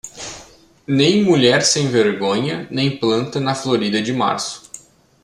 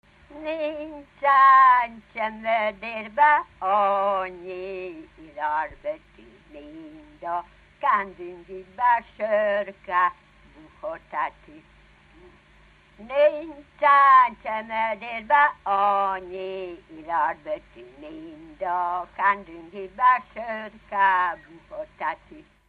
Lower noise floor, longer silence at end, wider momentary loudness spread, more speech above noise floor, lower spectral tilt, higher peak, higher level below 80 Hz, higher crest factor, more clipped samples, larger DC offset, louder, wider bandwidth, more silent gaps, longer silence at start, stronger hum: second, -44 dBFS vs -55 dBFS; first, 0.45 s vs 0.25 s; second, 19 LU vs 22 LU; second, 27 dB vs 31 dB; second, -4 dB/octave vs -5.5 dB/octave; first, -2 dBFS vs -6 dBFS; about the same, -56 dBFS vs -60 dBFS; about the same, 16 dB vs 18 dB; neither; neither; first, -17 LUFS vs -22 LUFS; first, 13 kHz vs 4.8 kHz; neither; second, 0.05 s vs 0.3 s; neither